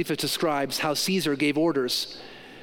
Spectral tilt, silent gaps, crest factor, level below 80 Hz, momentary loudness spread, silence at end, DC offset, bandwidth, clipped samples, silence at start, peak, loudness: -3.5 dB/octave; none; 14 dB; -62 dBFS; 10 LU; 0 s; under 0.1%; 17 kHz; under 0.1%; 0 s; -12 dBFS; -25 LUFS